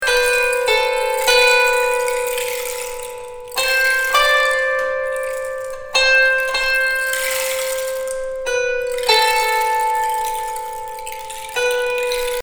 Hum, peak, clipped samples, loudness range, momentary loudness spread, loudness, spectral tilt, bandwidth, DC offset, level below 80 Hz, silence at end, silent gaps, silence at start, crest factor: none; 0 dBFS; under 0.1%; 3 LU; 13 LU; -17 LUFS; 1.5 dB/octave; over 20 kHz; under 0.1%; -42 dBFS; 0 s; none; 0 s; 18 dB